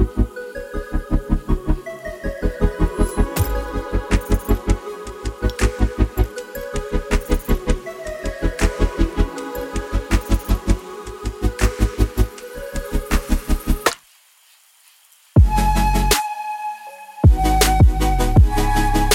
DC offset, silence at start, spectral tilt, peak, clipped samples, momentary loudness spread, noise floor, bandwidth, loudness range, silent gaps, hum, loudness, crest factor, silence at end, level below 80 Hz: under 0.1%; 0 s; -5.5 dB/octave; 0 dBFS; under 0.1%; 14 LU; -53 dBFS; 17 kHz; 6 LU; none; none; -21 LUFS; 18 dB; 0 s; -22 dBFS